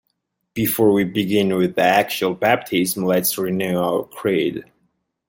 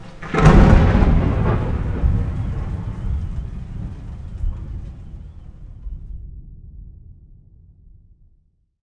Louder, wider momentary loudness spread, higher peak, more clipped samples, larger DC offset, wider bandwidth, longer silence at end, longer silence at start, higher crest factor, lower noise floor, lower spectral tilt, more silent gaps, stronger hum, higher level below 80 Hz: about the same, -19 LUFS vs -19 LUFS; second, 6 LU vs 26 LU; about the same, -2 dBFS vs 0 dBFS; neither; neither; first, 17 kHz vs 9.4 kHz; second, 0.65 s vs 1.7 s; first, 0.55 s vs 0 s; about the same, 18 dB vs 20 dB; first, -73 dBFS vs -59 dBFS; second, -4.5 dB/octave vs -8 dB/octave; neither; neither; second, -58 dBFS vs -22 dBFS